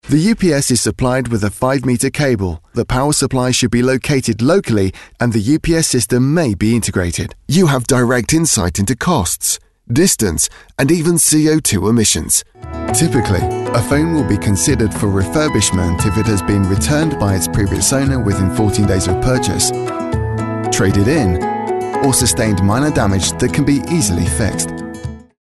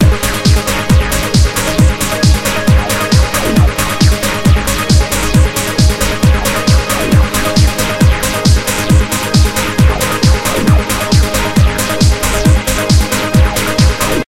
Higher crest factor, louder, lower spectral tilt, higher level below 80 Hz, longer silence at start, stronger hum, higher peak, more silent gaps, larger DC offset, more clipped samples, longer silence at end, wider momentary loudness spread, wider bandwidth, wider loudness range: about the same, 12 dB vs 10 dB; second, -14 LUFS vs -11 LUFS; about the same, -4.5 dB/octave vs -4.5 dB/octave; second, -32 dBFS vs -16 dBFS; about the same, 0.05 s vs 0 s; neither; about the same, -2 dBFS vs 0 dBFS; neither; first, 0.3% vs under 0.1%; neither; first, 0.2 s vs 0 s; first, 6 LU vs 1 LU; second, 12.5 kHz vs 17 kHz; about the same, 2 LU vs 0 LU